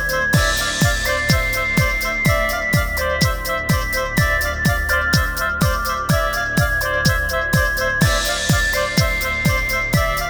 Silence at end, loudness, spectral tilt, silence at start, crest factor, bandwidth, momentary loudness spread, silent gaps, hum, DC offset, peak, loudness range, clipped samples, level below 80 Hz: 0 s; -18 LUFS; -4 dB/octave; 0 s; 16 dB; over 20 kHz; 2 LU; none; none; under 0.1%; -2 dBFS; 1 LU; under 0.1%; -26 dBFS